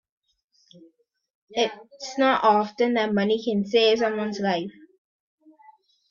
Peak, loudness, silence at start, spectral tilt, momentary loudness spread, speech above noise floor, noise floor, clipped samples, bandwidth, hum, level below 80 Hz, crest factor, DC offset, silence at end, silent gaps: -8 dBFS; -23 LUFS; 1.5 s; -5 dB/octave; 11 LU; 40 dB; -62 dBFS; under 0.1%; 7.4 kHz; none; -68 dBFS; 18 dB; under 0.1%; 1.4 s; none